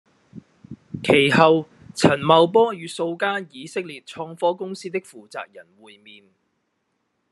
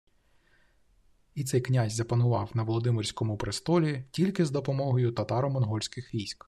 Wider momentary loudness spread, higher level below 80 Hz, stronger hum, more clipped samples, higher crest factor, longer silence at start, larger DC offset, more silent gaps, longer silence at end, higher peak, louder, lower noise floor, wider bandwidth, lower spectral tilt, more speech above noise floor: first, 20 LU vs 7 LU; about the same, -62 dBFS vs -58 dBFS; neither; neither; first, 22 dB vs 16 dB; second, 0.35 s vs 1.35 s; neither; neither; first, 1.7 s vs 0.15 s; first, 0 dBFS vs -12 dBFS; first, -20 LUFS vs -29 LUFS; first, -73 dBFS vs -65 dBFS; second, 12 kHz vs 13.5 kHz; second, -5 dB/octave vs -6.5 dB/octave; first, 52 dB vs 37 dB